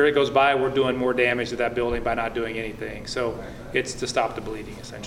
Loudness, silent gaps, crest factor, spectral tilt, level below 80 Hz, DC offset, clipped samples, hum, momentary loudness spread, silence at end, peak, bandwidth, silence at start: -24 LUFS; none; 18 dB; -4.5 dB/octave; -44 dBFS; under 0.1%; under 0.1%; none; 14 LU; 0 s; -6 dBFS; 15 kHz; 0 s